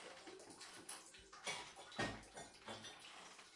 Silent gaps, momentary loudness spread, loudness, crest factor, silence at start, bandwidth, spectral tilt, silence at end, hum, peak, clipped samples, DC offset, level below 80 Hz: none; 11 LU; -51 LUFS; 22 dB; 0 s; 12 kHz; -2.5 dB/octave; 0 s; none; -30 dBFS; under 0.1%; under 0.1%; -74 dBFS